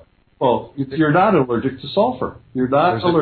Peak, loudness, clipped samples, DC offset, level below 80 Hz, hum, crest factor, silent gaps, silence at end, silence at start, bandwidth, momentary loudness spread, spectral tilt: -4 dBFS; -18 LUFS; under 0.1%; under 0.1%; -50 dBFS; none; 14 dB; none; 0 s; 0.4 s; 4.6 kHz; 10 LU; -10.5 dB/octave